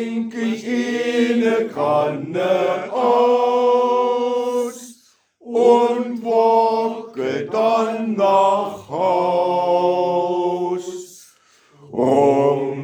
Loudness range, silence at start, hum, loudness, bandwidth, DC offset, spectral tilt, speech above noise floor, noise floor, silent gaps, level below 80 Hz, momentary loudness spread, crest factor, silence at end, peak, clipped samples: 2 LU; 0 s; none; -18 LUFS; 13.5 kHz; under 0.1%; -6 dB/octave; 37 dB; -55 dBFS; none; -72 dBFS; 10 LU; 16 dB; 0 s; -2 dBFS; under 0.1%